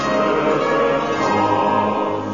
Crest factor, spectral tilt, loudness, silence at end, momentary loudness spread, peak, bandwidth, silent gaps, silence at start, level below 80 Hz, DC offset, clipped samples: 12 dB; -5.5 dB/octave; -18 LUFS; 0 s; 2 LU; -4 dBFS; 7.4 kHz; none; 0 s; -48 dBFS; 0.4%; under 0.1%